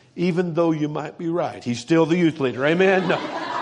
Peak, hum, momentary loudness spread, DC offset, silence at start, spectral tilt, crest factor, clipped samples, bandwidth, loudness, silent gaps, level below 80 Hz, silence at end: -4 dBFS; none; 9 LU; under 0.1%; 0.15 s; -6.5 dB/octave; 16 dB; under 0.1%; 10 kHz; -21 LUFS; none; -66 dBFS; 0 s